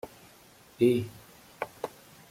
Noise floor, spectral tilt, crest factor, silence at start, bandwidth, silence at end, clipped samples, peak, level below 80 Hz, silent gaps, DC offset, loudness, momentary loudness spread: -56 dBFS; -7 dB/octave; 20 dB; 0.05 s; 16 kHz; 0.45 s; under 0.1%; -12 dBFS; -66 dBFS; none; under 0.1%; -30 LUFS; 20 LU